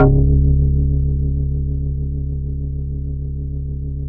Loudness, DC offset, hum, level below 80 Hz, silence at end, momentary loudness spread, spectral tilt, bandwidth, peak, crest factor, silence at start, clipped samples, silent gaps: -20 LUFS; under 0.1%; none; -20 dBFS; 0 s; 11 LU; -14.5 dB/octave; 1.6 kHz; -2 dBFS; 16 dB; 0 s; under 0.1%; none